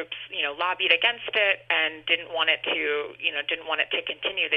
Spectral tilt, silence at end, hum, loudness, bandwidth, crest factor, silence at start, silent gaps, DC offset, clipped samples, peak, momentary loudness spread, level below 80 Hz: -4 dB/octave; 0 s; none; -24 LUFS; 5.8 kHz; 22 dB; 0 s; none; under 0.1%; under 0.1%; -4 dBFS; 7 LU; -68 dBFS